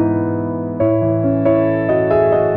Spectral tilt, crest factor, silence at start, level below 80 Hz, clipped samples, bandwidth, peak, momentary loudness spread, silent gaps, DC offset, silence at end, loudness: -12 dB/octave; 12 dB; 0 s; -44 dBFS; under 0.1%; 4.3 kHz; -4 dBFS; 6 LU; none; 0.1%; 0 s; -16 LUFS